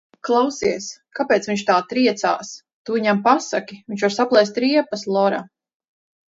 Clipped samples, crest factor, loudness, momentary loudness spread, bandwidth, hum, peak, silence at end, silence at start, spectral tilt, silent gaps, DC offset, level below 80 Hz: under 0.1%; 20 dB; -20 LUFS; 12 LU; 7.8 kHz; none; -2 dBFS; 0.85 s; 0.25 s; -4.5 dB/octave; 2.73-2.85 s; under 0.1%; -64 dBFS